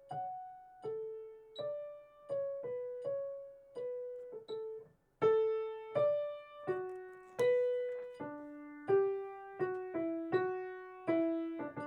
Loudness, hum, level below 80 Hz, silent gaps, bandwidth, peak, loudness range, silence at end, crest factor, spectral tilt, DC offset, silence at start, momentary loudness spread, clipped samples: -38 LUFS; none; -80 dBFS; none; 11 kHz; -20 dBFS; 7 LU; 0 s; 18 dB; -7 dB/octave; under 0.1%; 0 s; 16 LU; under 0.1%